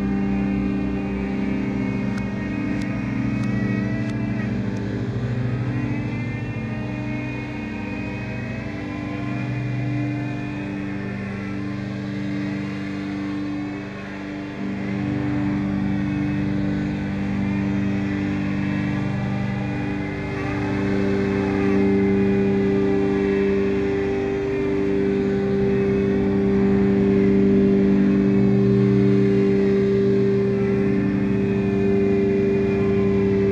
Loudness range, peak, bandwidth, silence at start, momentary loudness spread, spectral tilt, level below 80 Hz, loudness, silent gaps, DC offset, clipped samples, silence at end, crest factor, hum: 10 LU; -6 dBFS; 7.6 kHz; 0 s; 10 LU; -9 dB/octave; -40 dBFS; -22 LUFS; none; under 0.1%; under 0.1%; 0 s; 14 dB; 50 Hz at -60 dBFS